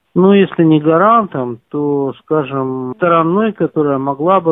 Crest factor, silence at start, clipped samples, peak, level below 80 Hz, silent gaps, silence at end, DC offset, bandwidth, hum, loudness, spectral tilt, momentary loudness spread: 12 dB; 0.15 s; under 0.1%; 0 dBFS; -56 dBFS; none; 0 s; under 0.1%; 3.9 kHz; none; -13 LUFS; -11.5 dB/octave; 10 LU